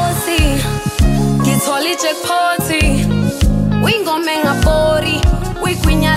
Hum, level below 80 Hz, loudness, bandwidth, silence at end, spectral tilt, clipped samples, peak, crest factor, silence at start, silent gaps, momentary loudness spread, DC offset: none; -20 dBFS; -14 LUFS; 16 kHz; 0 s; -5 dB/octave; under 0.1%; 0 dBFS; 12 dB; 0 s; none; 3 LU; under 0.1%